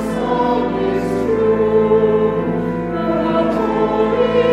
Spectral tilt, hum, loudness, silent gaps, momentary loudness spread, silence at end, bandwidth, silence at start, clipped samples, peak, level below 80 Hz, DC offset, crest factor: -7.5 dB/octave; none; -16 LUFS; none; 5 LU; 0 s; 11.5 kHz; 0 s; under 0.1%; -4 dBFS; -38 dBFS; under 0.1%; 12 dB